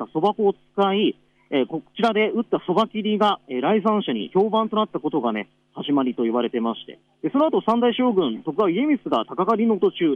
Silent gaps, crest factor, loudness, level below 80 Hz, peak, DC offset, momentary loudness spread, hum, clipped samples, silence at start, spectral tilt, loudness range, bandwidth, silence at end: none; 14 dB; -22 LUFS; -70 dBFS; -8 dBFS; under 0.1%; 6 LU; none; under 0.1%; 0 s; -7.5 dB/octave; 2 LU; 7.4 kHz; 0 s